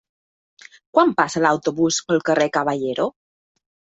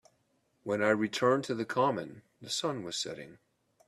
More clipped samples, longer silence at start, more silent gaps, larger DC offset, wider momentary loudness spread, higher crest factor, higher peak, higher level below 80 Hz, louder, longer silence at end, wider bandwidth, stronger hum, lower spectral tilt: neither; first, 0.95 s vs 0.65 s; neither; neither; second, 6 LU vs 18 LU; about the same, 20 dB vs 20 dB; first, -2 dBFS vs -12 dBFS; first, -62 dBFS vs -76 dBFS; first, -20 LUFS vs -31 LUFS; first, 0.9 s vs 0.55 s; second, 8.2 kHz vs 13.5 kHz; neither; about the same, -4 dB/octave vs -4 dB/octave